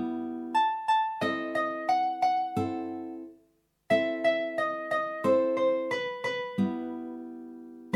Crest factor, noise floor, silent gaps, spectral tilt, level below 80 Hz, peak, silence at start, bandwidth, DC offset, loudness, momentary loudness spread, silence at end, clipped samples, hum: 16 dB; -69 dBFS; none; -6 dB/octave; -76 dBFS; -12 dBFS; 0 s; 13 kHz; under 0.1%; -29 LUFS; 15 LU; 0 s; under 0.1%; 50 Hz at -60 dBFS